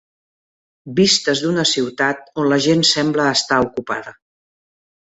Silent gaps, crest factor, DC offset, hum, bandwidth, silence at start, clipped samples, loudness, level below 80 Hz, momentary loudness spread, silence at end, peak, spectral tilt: none; 16 dB; under 0.1%; none; 8.2 kHz; 0.85 s; under 0.1%; -17 LUFS; -54 dBFS; 10 LU; 1 s; -2 dBFS; -3.5 dB/octave